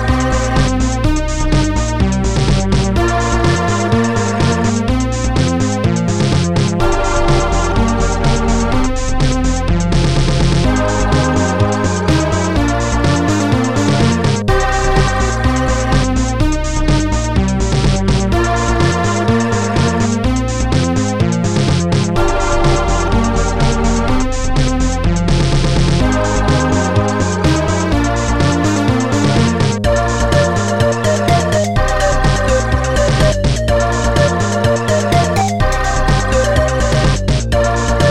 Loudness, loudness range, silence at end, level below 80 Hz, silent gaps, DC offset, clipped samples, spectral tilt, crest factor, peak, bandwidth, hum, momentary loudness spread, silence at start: -14 LUFS; 1 LU; 0 s; -20 dBFS; none; 2%; under 0.1%; -5.5 dB/octave; 12 dB; 0 dBFS; 13 kHz; none; 2 LU; 0 s